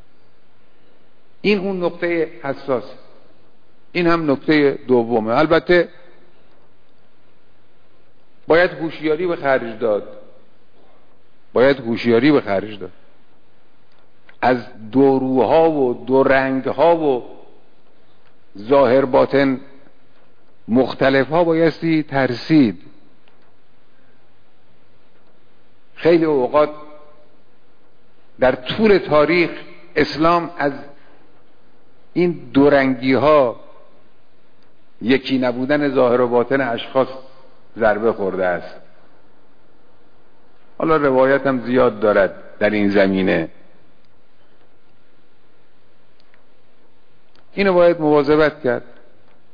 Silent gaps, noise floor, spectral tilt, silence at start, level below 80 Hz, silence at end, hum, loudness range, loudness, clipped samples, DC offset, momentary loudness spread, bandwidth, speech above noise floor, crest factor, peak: none; -58 dBFS; -8 dB/octave; 1.45 s; -48 dBFS; 0.75 s; none; 6 LU; -17 LUFS; under 0.1%; 2%; 10 LU; 5.2 kHz; 41 dB; 14 dB; -4 dBFS